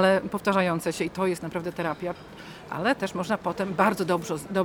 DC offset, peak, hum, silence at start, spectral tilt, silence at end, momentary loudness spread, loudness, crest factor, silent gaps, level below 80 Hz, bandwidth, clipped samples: under 0.1%; -6 dBFS; none; 0 s; -5.5 dB/octave; 0 s; 11 LU; -27 LUFS; 20 dB; none; -58 dBFS; 18 kHz; under 0.1%